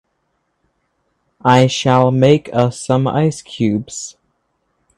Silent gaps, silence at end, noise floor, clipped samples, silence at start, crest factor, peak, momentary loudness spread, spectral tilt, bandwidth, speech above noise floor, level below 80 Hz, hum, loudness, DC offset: none; 0.85 s; -68 dBFS; under 0.1%; 1.45 s; 16 dB; 0 dBFS; 11 LU; -6 dB/octave; 11 kHz; 53 dB; -52 dBFS; none; -15 LUFS; under 0.1%